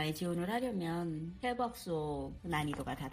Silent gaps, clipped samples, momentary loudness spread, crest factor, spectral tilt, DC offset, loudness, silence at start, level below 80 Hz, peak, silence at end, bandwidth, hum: none; under 0.1%; 5 LU; 16 dB; -6 dB/octave; under 0.1%; -38 LUFS; 0 s; -56 dBFS; -22 dBFS; 0 s; 15.5 kHz; none